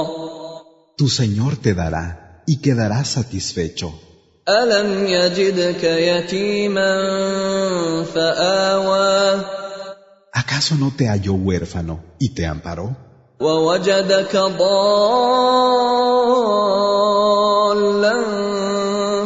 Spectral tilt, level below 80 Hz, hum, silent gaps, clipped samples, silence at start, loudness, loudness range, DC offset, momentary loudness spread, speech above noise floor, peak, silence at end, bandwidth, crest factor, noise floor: -5 dB/octave; -44 dBFS; none; none; under 0.1%; 0 s; -17 LUFS; 6 LU; under 0.1%; 13 LU; 22 dB; -2 dBFS; 0 s; 8 kHz; 14 dB; -39 dBFS